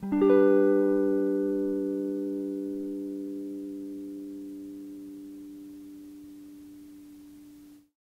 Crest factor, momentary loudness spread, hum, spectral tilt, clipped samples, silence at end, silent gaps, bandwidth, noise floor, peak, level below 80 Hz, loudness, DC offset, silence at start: 20 dB; 26 LU; none; -8.5 dB/octave; under 0.1%; 0.25 s; none; 15 kHz; -52 dBFS; -10 dBFS; -68 dBFS; -27 LUFS; under 0.1%; 0 s